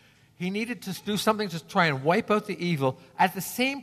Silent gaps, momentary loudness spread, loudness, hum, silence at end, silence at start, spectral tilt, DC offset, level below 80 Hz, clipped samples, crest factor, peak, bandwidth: none; 8 LU; -27 LUFS; none; 0 s; 0.4 s; -5 dB/octave; under 0.1%; -68 dBFS; under 0.1%; 20 dB; -8 dBFS; 14 kHz